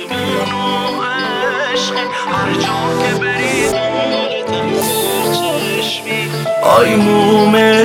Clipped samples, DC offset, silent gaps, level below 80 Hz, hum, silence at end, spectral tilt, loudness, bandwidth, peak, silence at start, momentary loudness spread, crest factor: under 0.1%; under 0.1%; none; -48 dBFS; none; 0 s; -4 dB/octave; -14 LUFS; 17.5 kHz; 0 dBFS; 0 s; 8 LU; 14 dB